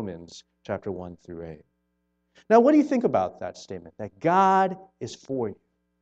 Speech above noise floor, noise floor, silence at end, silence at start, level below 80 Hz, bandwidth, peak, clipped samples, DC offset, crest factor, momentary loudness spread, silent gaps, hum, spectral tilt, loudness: 50 dB; -75 dBFS; 0.5 s; 0 s; -64 dBFS; 8 kHz; -4 dBFS; under 0.1%; under 0.1%; 22 dB; 21 LU; none; none; -6.5 dB/octave; -23 LUFS